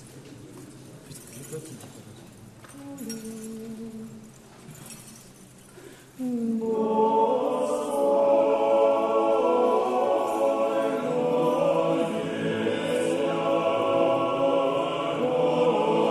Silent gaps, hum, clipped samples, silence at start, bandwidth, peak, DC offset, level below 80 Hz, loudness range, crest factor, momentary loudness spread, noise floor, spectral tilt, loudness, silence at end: none; none; under 0.1%; 0 s; 13.5 kHz; -10 dBFS; under 0.1%; -66 dBFS; 17 LU; 16 dB; 22 LU; -49 dBFS; -5.5 dB/octave; -24 LUFS; 0 s